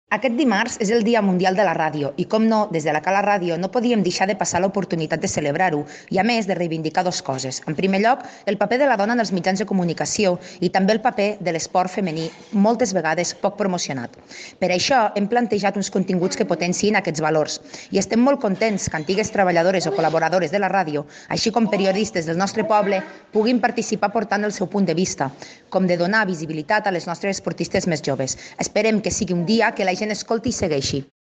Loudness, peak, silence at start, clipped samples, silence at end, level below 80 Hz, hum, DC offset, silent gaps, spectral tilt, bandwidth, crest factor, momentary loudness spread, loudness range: -21 LUFS; -6 dBFS; 0.1 s; under 0.1%; 0.3 s; -54 dBFS; none; under 0.1%; none; -4.5 dB/octave; 9 kHz; 16 dB; 7 LU; 2 LU